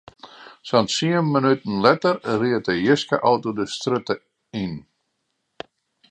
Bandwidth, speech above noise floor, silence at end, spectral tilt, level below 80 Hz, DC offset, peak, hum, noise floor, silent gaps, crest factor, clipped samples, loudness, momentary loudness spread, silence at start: 11 kHz; 54 dB; 1.3 s; -5.5 dB/octave; -60 dBFS; under 0.1%; 0 dBFS; none; -74 dBFS; none; 22 dB; under 0.1%; -21 LUFS; 20 LU; 0.25 s